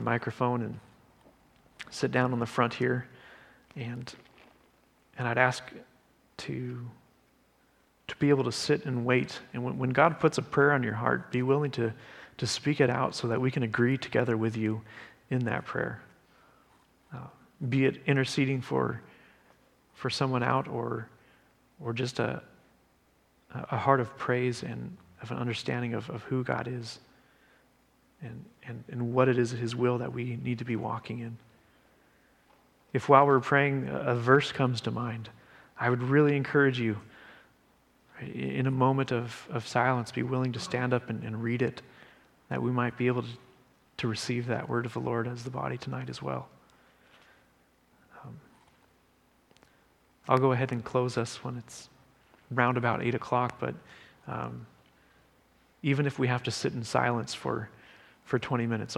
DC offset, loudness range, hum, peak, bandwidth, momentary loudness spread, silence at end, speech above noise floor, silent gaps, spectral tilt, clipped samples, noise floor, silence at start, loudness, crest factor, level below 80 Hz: under 0.1%; 8 LU; none; -4 dBFS; 12 kHz; 20 LU; 0 s; 38 dB; none; -6 dB/octave; under 0.1%; -67 dBFS; 0 s; -30 LUFS; 26 dB; -68 dBFS